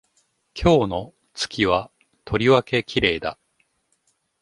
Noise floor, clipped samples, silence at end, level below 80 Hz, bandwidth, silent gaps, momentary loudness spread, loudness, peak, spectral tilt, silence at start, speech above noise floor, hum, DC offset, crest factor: -69 dBFS; under 0.1%; 1.1 s; -42 dBFS; 11.5 kHz; none; 14 LU; -21 LUFS; -2 dBFS; -5.5 dB/octave; 0.55 s; 48 dB; none; under 0.1%; 20 dB